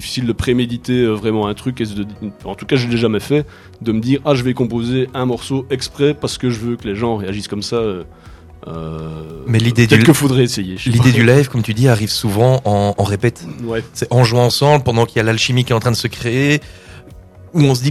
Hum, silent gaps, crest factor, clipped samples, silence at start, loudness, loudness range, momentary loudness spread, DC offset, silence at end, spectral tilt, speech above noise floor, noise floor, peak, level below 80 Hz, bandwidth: none; none; 16 dB; 0.2%; 0 s; -15 LUFS; 7 LU; 13 LU; under 0.1%; 0 s; -6 dB/octave; 23 dB; -38 dBFS; 0 dBFS; -42 dBFS; 14 kHz